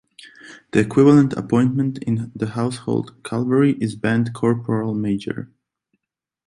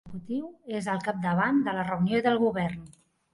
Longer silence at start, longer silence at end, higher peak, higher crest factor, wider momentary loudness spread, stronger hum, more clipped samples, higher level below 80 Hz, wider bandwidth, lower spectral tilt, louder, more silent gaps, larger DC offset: first, 0.25 s vs 0.05 s; first, 1.05 s vs 0.4 s; first, -2 dBFS vs -12 dBFS; about the same, 18 dB vs 16 dB; about the same, 11 LU vs 10 LU; neither; neither; first, -54 dBFS vs -60 dBFS; about the same, 11.5 kHz vs 11.5 kHz; about the same, -7.5 dB/octave vs -7 dB/octave; first, -20 LUFS vs -28 LUFS; neither; neither